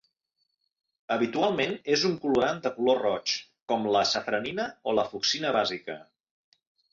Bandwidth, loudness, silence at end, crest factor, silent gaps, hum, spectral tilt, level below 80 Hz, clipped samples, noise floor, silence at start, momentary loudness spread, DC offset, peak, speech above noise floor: 7.6 kHz; -27 LUFS; 0.9 s; 18 dB; 3.62-3.66 s; none; -3.5 dB/octave; -68 dBFS; under 0.1%; -78 dBFS; 1.1 s; 7 LU; under 0.1%; -12 dBFS; 51 dB